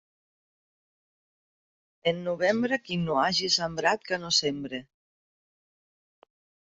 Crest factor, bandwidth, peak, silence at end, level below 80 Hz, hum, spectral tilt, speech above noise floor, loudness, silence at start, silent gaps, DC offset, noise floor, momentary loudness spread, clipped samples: 22 dB; 8.2 kHz; -10 dBFS; 1.9 s; -66 dBFS; none; -3.5 dB/octave; over 63 dB; -26 LUFS; 2.05 s; none; under 0.1%; under -90 dBFS; 7 LU; under 0.1%